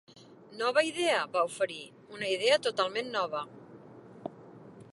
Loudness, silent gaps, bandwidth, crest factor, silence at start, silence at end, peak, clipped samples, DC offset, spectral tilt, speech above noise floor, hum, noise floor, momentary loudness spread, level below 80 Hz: -30 LUFS; none; 11.5 kHz; 22 dB; 0.15 s; 0.05 s; -12 dBFS; under 0.1%; under 0.1%; -2.5 dB/octave; 21 dB; none; -51 dBFS; 25 LU; -80 dBFS